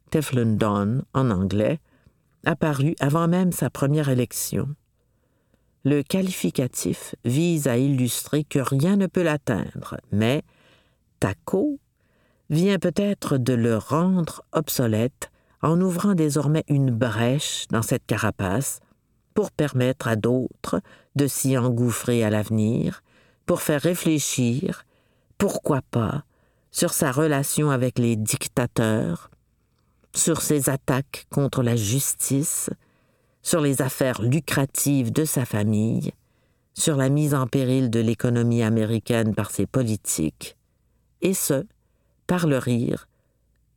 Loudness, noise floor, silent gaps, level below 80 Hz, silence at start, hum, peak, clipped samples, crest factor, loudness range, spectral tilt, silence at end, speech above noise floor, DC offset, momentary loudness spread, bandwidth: -23 LUFS; -67 dBFS; none; -54 dBFS; 0.1 s; none; -4 dBFS; under 0.1%; 18 dB; 3 LU; -5.5 dB/octave; 0.75 s; 44 dB; under 0.1%; 7 LU; 19 kHz